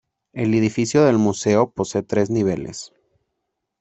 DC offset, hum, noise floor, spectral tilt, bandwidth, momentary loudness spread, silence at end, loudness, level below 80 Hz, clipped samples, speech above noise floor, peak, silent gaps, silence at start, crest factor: under 0.1%; none; -78 dBFS; -6 dB/octave; 8.4 kHz; 17 LU; 0.95 s; -19 LUFS; -56 dBFS; under 0.1%; 59 dB; -2 dBFS; none; 0.35 s; 18 dB